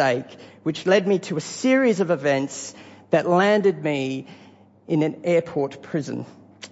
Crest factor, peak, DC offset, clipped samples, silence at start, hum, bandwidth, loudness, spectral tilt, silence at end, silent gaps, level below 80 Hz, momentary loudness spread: 18 dB; -4 dBFS; under 0.1%; under 0.1%; 0 s; none; 8 kHz; -22 LUFS; -5.5 dB/octave; 0.05 s; none; -72 dBFS; 15 LU